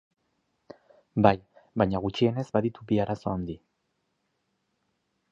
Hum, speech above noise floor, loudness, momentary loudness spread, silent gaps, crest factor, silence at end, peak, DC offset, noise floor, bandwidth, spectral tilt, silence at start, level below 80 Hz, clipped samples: none; 51 dB; -27 LUFS; 12 LU; none; 26 dB; 1.75 s; -4 dBFS; under 0.1%; -77 dBFS; 7.8 kHz; -8 dB/octave; 1.15 s; -54 dBFS; under 0.1%